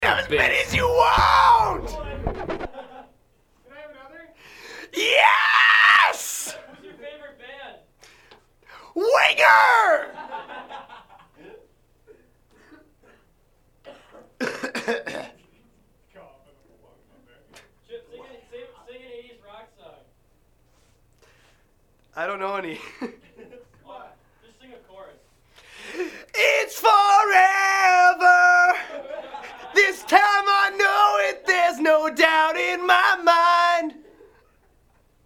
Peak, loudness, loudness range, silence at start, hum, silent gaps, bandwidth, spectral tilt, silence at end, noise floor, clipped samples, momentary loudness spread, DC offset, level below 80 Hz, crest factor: 0 dBFS; -18 LUFS; 18 LU; 0 s; none; none; 19 kHz; -2.5 dB/octave; 1.35 s; -61 dBFS; under 0.1%; 23 LU; under 0.1%; -48 dBFS; 22 dB